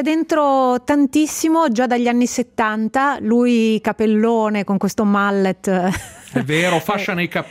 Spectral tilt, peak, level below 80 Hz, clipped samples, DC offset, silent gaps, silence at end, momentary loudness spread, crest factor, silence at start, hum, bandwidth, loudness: -5 dB/octave; -4 dBFS; -52 dBFS; under 0.1%; under 0.1%; none; 0 s; 5 LU; 12 dB; 0 s; none; 16 kHz; -17 LUFS